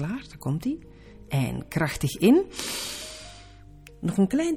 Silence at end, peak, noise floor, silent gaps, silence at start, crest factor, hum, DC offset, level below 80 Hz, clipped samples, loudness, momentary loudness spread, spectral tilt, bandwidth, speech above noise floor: 0 s; -8 dBFS; -48 dBFS; none; 0 s; 18 dB; none; under 0.1%; -50 dBFS; under 0.1%; -26 LUFS; 16 LU; -5.5 dB/octave; 17.5 kHz; 23 dB